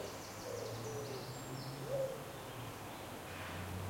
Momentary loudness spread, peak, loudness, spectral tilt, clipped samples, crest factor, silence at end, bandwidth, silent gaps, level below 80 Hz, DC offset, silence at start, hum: 7 LU; -28 dBFS; -45 LUFS; -4.5 dB/octave; under 0.1%; 16 dB; 0 s; 16.5 kHz; none; -66 dBFS; under 0.1%; 0 s; none